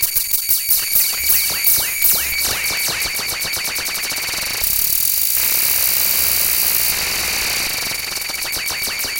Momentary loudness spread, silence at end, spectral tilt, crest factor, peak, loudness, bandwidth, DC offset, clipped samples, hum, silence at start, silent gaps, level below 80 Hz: 6 LU; 0 s; 1 dB/octave; 18 dB; 0 dBFS; -15 LUFS; 18 kHz; under 0.1%; under 0.1%; none; 0 s; none; -42 dBFS